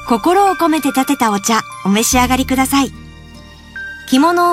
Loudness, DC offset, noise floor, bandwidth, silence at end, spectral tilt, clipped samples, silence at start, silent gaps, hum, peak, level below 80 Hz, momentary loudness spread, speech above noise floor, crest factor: -14 LUFS; under 0.1%; -37 dBFS; 16 kHz; 0 s; -3.5 dB/octave; under 0.1%; 0 s; none; none; 0 dBFS; -36 dBFS; 12 LU; 24 dB; 14 dB